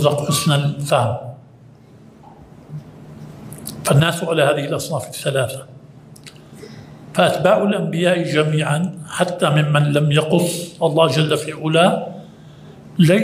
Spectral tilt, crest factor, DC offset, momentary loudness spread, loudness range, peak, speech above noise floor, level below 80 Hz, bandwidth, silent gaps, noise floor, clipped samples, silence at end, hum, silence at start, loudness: -5.5 dB/octave; 18 dB; under 0.1%; 21 LU; 6 LU; 0 dBFS; 28 dB; -56 dBFS; 16 kHz; none; -45 dBFS; under 0.1%; 0 s; none; 0 s; -18 LUFS